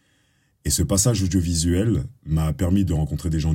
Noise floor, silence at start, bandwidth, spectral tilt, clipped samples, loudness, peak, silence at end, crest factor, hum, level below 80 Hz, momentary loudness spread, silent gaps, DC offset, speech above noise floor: -64 dBFS; 0.65 s; 16.5 kHz; -5.5 dB/octave; under 0.1%; -22 LUFS; -6 dBFS; 0 s; 16 dB; none; -36 dBFS; 6 LU; none; under 0.1%; 43 dB